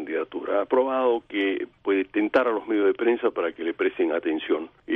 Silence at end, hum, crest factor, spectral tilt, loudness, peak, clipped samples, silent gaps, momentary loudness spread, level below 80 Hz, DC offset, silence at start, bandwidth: 0 s; none; 16 dB; -6.5 dB/octave; -25 LUFS; -8 dBFS; under 0.1%; none; 6 LU; -66 dBFS; under 0.1%; 0 s; 5.2 kHz